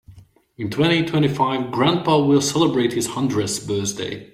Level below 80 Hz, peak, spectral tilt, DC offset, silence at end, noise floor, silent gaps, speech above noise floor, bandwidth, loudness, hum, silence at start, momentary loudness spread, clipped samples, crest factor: -54 dBFS; -4 dBFS; -5 dB/octave; under 0.1%; 0.1 s; -47 dBFS; none; 28 dB; 15.5 kHz; -20 LUFS; none; 0.1 s; 8 LU; under 0.1%; 16 dB